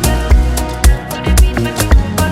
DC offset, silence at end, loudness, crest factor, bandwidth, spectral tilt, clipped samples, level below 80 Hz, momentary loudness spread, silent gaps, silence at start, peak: under 0.1%; 0 s; -13 LUFS; 10 dB; 16 kHz; -5 dB/octave; under 0.1%; -12 dBFS; 3 LU; none; 0 s; 0 dBFS